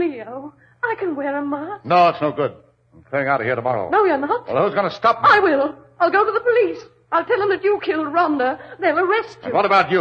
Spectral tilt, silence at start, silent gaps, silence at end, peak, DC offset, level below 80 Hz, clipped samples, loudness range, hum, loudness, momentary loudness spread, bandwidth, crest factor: -6.5 dB/octave; 0 s; none; 0 s; -2 dBFS; under 0.1%; -60 dBFS; under 0.1%; 4 LU; none; -19 LUFS; 10 LU; 7.2 kHz; 16 dB